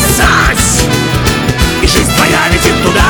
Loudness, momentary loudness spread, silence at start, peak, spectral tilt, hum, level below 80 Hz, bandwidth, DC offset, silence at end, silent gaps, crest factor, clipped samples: -9 LUFS; 4 LU; 0 s; 0 dBFS; -3.5 dB/octave; none; -18 dBFS; over 20 kHz; 0.2%; 0 s; none; 8 dB; under 0.1%